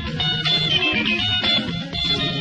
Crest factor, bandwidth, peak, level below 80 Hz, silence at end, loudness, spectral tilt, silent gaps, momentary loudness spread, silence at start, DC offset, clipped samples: 14 dB; 10.5 kHz; -6 dBFS; -42 dBFS; 0 s; -18 LUFS; -4.5 dB/octave; none; 4 LU; 0 s; under 0.1%; under 0.1%